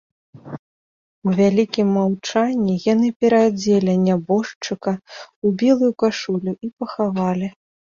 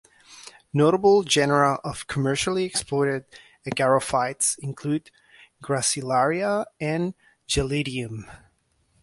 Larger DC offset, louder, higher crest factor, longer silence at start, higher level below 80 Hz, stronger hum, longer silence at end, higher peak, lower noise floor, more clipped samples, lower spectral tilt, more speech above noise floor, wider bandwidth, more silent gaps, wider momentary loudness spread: neither; first, -19 LUFS vs -23 LUFS; about the same, 16 dB vs 18 dB; about the same, 0.35 s vs 0.3 s; second, -60 dBFS vs -48 dBFS; neither; second, 0.45 s vs 0.65 s; about the same, -4 dBFS vs -6 dBFS; first, under -90 dBFS vs -67 dBFS; neither; first, -6.5 dB/octave vs -4 dB/octave; first, over 72 dB vs 43 dB; second, 7.4 kHz vs 12 kHz; first, 0.59-1.22 s, 3.16-3.20 s, 4.56-4.61 s, 5.36-5.42 s, 6.73-6.77 s vs none; about the same, 12 LU vs 13 LU